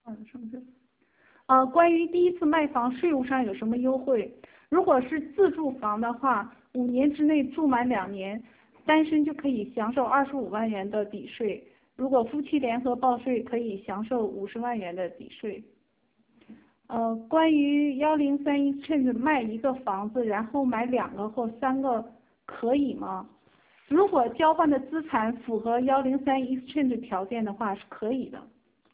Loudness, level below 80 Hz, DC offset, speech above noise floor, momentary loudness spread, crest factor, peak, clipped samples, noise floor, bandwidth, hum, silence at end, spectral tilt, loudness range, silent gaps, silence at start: -27 LUFS; -64 dBFS; under 0.1%; 44 dB; 13 LU; 20 dB; -8 dBFS; under 0.1%; -70 dBFS; 4 kHz; none; 0.5 s; -9.5 dB/octave; 4 LU; none; 0.05 s